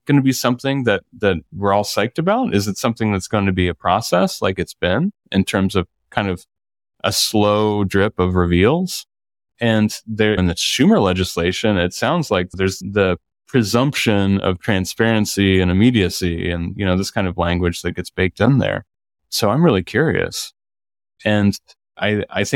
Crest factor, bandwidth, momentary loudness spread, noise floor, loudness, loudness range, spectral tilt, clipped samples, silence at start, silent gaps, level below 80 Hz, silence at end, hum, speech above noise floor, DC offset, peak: 16 dB; 17 kHz; 7 LU; under -90 dBFS; -18 LUFS; 2 LU; -5.5 dB/octave; under 0.1%; 0.05 s; none; -42 dBFS; 0 s; none; over 73 dB; under 0.1%; -2 dBFS